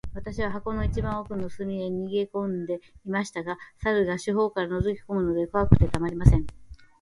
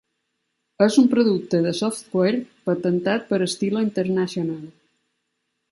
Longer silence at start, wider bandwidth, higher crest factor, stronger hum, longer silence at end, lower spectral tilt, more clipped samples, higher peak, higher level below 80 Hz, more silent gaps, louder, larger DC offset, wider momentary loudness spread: second, 0.05 s vs 0.8 s; about the same, 11.5 kHz vs 11.5 kHz; first, 26 dB vs 18 dB; neither; second, 0.2 s vs 1 s; first, -7.5 dB/octave vs -6 dB/octave; neither; first, 0 dBFS vs -4 dBFS; first, -34 dBFS vs -68 dBFS; neither; second, -27 LUFS vs -21 LUFS; neither; first, 12 LU vs 9 LU